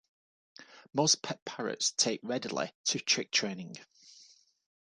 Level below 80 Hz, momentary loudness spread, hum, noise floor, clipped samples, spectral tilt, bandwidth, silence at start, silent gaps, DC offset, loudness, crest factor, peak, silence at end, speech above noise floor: -80 dBFS; 12 LU; none; -61 dBFS; under 0.1%; -2 dB/octave; 11.5 kHz; 0.6 s; 1.42-1.46 s, 2.75-2.84 s; under 0.1%; -31 LUFS; 22 dB; -12 dBFS; 0.6 s; 28 dB